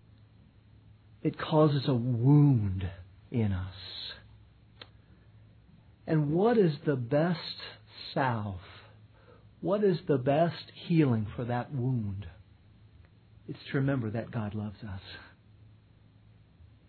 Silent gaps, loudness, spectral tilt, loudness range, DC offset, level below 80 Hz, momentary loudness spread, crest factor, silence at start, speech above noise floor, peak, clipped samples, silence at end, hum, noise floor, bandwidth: none; -29 LUFS; -11 dB/octave; 9 LU; under 0.1%; -60 dBFS; 19 LU; 18 dB; 1.25 s; 31 dB; -12 dBFS; under 0.1%; 1.65 s; none; -59 dBFS; 4.6 kHz